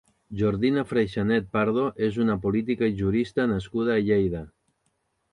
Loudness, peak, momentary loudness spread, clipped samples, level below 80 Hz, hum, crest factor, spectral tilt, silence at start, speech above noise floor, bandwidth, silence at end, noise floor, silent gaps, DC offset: -25 LUFS; -10 dBFS; 4 LU; under 0.1%; -48 dBFS; none; 16 dB; -8 dB/octave; 0.3 s; 49 dB; 9.8 kHz; 0.85 s; -73 dBFS; none; under 0.1%